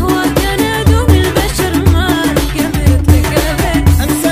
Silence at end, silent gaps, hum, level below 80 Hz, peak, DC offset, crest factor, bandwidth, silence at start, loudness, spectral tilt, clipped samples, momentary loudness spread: 0 s; none; none; -18 dBFS; 0 dBFS; 1%; 10 dB; 16.5 kHz; 0 s; -12 LUFS; -5.5 dB/octave; 0.4%; 4 LU